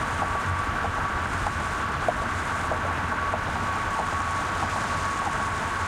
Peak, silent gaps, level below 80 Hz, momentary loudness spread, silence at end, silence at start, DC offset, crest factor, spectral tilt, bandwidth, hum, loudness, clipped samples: -10 dBFS; none; -40 dBFS; 1 LU; 0 s; 0 s; under 0.1%; 18 dB; -4.5 dB/octave; 16 kHz; none; -27 LUFS; under 0.1%